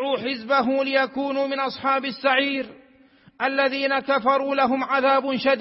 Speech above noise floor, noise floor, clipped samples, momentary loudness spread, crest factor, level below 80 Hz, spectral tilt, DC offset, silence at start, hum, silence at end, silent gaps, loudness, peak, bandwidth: 32 dB; -54 dBFS; under 0.1%; 5 LU; 16 dB; -68 dBFS; -8 dB/octave; under 0.1%; 0 s; none; 0 s; none; -22 LUFS; -6 dBFS; 5.8 kHz